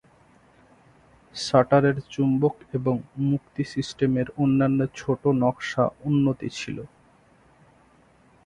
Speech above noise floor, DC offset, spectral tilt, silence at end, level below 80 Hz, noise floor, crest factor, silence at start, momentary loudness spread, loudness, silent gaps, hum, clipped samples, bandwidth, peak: 34 dB; under 0.1%; -7 dB/octave; 1.6 s; -58 dBFS; -58 dBFS; 22 dB; 1.35 s; 11 LU; -24 LUFS; none; none; under 0.1%; 10.5 kHz; -4 dBFS